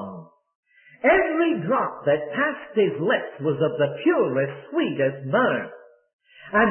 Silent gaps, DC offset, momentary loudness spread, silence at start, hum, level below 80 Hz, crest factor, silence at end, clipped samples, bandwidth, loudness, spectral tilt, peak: 0.55-0.63 s, 6.13-6.19 s; under 0.1%; 7 LU; 0 s; none; -58 dBFS; 18 dB; 0 s; under 0.1%; 3.3 kHz; -23 LUFS; -11 dB/octave; -6 dBFS